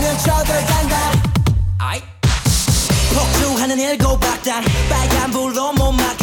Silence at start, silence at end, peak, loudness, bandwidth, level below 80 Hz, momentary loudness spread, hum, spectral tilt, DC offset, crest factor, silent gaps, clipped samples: 0 s; 0 s; -4 dBFS; -16 LUFS; 19 kHz; -22 dBFS; 4 LU; none; -4.5 dB/octave; under 0.1%; 12 dB; none; under 0.1%